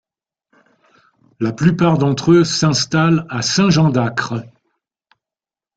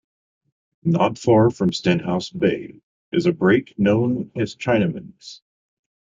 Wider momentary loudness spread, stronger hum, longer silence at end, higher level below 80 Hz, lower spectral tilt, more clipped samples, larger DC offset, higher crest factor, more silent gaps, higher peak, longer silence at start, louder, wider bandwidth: second, 10 LU vs 15 LU; neither; first, 1.3 s vs 0.7 s; about the same, -52 dBFS vs -54 dBFS; second, -5.5 dB/octave vs -7 dB/octave; neither; neither; about the same, 16 dB vs 18 dB; second, none vs 2.83-3.12 s; first, 0 dBFS vs -4 dBFS; first, 1.4 s vs 0.85 s; first, -15 LUFS vs -20 LUFS; first, 9 kHz vs 7.8 kHz